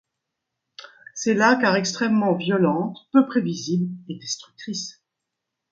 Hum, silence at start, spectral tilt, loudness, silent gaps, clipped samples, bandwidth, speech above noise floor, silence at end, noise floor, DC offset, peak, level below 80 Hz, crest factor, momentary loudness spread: none; 0.8 s; -5 dB/octave; -22 LUFS; none; under 0.1%; 7.8 kHz; 61 dB; 0.8 s; -82 dBFS; under 0.1%; -4 dBFS; -70 dBFS; 20 dB; 14 LU